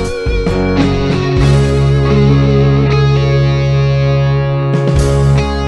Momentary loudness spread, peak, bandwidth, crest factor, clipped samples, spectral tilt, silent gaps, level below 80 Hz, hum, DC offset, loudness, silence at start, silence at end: 4 LU; 0 dBFS; 10.5 kHz; 10 dB; under 0.1%; -7.5 dB/octave; none; -20 dBFS; none; under 0.1%; -12 LUFS; 0 s; 0 s